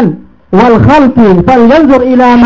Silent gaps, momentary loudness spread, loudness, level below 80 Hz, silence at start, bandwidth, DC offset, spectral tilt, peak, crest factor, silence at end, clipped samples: none; 8 LU; -5 LUFS; -28 dBFS; 0 s; 7.6 kHz; under 0.1%; -8.5 dB/octave; 0 dBFS; 4 dB; 0 s; 6%